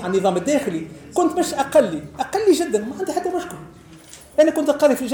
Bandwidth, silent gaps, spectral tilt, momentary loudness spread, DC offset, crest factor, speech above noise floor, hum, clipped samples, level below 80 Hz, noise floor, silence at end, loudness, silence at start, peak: over 20 kHz; none; -4.5 dB/octave; 10 LU; under 0.1%; 16 dB; 24 dB; none; under 0.1%; -54 dBFS; -43 dBFS; 0 s; -20 LUFS; 0 s; -4 dBFS